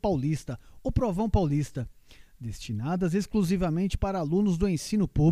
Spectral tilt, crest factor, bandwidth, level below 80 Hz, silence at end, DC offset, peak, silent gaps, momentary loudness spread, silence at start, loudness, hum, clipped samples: -7.5 dB/octave; 16 dB; 14.5 kHz; -38 dBFS; 0 s; under 0.1%; -10 dBFS; none; 13 LU; 0.05 s; -28 LUFS; none; under 0.1%